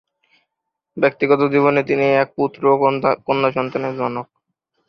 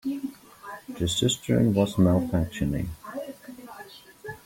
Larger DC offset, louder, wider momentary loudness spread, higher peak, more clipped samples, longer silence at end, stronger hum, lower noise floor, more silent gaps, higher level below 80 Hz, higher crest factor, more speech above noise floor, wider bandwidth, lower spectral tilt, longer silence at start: neither; first, -18 LUFS vs -25 LUFS; second, 8 LU vs 21 LU; first, -2 dBFS vs -8 dBFS; neither; first, 0.65 s vs 0.1 s; neither; first, -80 dBFS vs -47 dBFS; neither; second, -62 dBFS vs -46 dBFS; about the same, 16 dB vs 18 dB; first, 62 dB vs 23 dB; second, 6.2 kHz vs 16.5 kHz; first, -8 dB/octave vs -5.5 dB/octave; first, 0.95 s vs 0.05 s